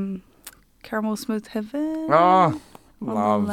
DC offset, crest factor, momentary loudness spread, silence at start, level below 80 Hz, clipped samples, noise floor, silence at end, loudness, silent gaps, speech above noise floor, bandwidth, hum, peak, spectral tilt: under 0.1%; 18 dB; 17 LU; 0 s; -60 dBFS; under 0.1%; -48 dBFS; 0 s; -22 LUFS; none; 26 dB; 17 kHz; none; -4 dBFS; -6.5 dB/octave